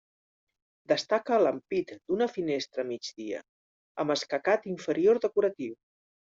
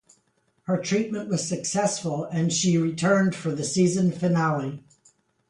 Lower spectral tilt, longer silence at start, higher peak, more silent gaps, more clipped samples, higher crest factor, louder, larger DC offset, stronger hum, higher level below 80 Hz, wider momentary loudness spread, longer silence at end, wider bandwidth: second, -3.5 dB/octave vs -5 dB/octave; first, 0.9 s vs 0.7 s; about the same, -12 dBFS vs -10 dBFS; first, 3.49-3.95 s vs none; neither; about the same, 18 dB vs 16 dB; second, -29 LUFS vs -24 LUFS; neither; neither; second, -74 dBFS vs -64 dBFS; first, 14 LU vs 7 LU; about the same, 0.65 s vs 0.7 s; second, 7.8 kHz vs 11 kHz